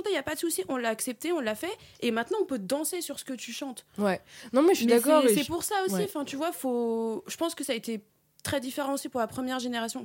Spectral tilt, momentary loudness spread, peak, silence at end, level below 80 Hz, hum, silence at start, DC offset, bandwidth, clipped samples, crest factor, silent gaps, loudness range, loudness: -3.5 dB/octave; 13 LU; -10 dBFS; 0 s; -68 dBFS; none; 0 s; under 0.1%; 17 kHz; under 0.1%; 20 dB; none; 6 LU; -29 LUFS